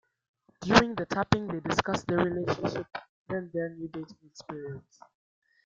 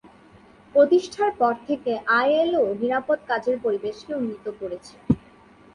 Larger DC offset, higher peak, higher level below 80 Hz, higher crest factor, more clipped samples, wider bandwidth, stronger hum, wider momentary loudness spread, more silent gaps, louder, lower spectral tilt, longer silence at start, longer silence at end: neither; first, -2 dBFS vs -6 dBFS; about the same, -56 dBFS vs -54 dBFS; first, 30 dB vs 18 dB; neither; second, 7.8 kHz vs 11 kHz; neither; first, 20 LU vs 12 LU; first, 3.09-3.26 s vs none; second, -29 LUFS vs -23 LUFS; about the same, -5.5 dB/octave vs -6.5 dB/octave; second, 0.6 s vs 0.75 s; first, 0.85 s vs 0.55 s